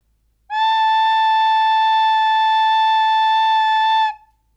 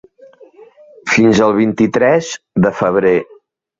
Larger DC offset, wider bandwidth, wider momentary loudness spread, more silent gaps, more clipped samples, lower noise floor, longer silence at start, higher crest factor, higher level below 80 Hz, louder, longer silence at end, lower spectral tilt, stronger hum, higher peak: neither; first, 9.2 kHz vs 7.8 kHz; second, 3 LU vs 7 LU; neither; neither; first, -59 dBFS vs -43 dBFS; about the same, 0.5 s vs 0.6 s; second, 6 dB vs 14 dB; second, -62 dBFS vs -48 dBFS; about the same, -15 LUFS vs -13 LUFS; second, 0.4 s vs 0.55 s; second, 3.5 dB/octave vs -6 dB/octave; neither; second, -10 dBFS vs -2 dBFS